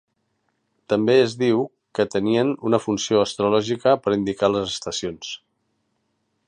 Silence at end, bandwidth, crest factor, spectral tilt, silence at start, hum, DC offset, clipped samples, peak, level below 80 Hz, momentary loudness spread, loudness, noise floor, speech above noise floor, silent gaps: 1.1 s; 10.5 kHz; 18 dB; -5 dB/octave; 0.9 s; none; under 0.1%; under 0.1%; -4 dBFS; -58 dBFS; 10 LU; -21 LUFS; -72 dBFS; 51 dB; none